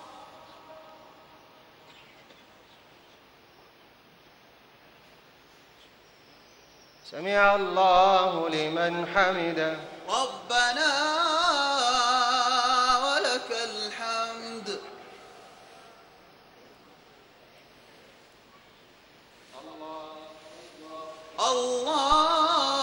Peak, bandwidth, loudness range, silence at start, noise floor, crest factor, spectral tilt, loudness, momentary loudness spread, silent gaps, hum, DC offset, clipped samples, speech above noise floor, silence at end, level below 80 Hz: -6 dBFS; 16 kHz; 22 LU; 0 s; -56 dBFS; 22 dB; -2 dB/octave; -25 LUFS; 24 LU; none; none; under 0.1%; under 0.1%; 32 dB; 0 s; -60 dBFS